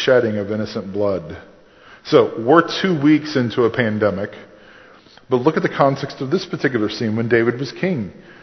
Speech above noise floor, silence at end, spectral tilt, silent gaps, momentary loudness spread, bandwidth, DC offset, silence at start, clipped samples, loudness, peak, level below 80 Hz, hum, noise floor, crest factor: 28 dB; 0.25 s; -6.5 dB/octave; none; 11 LU; 6.4 kHz; under 0.1%; 0 s; under 0.1%; -18 LUFS; 0 dBFS; -52 dBFS; none; -46 dBFS; 18 dB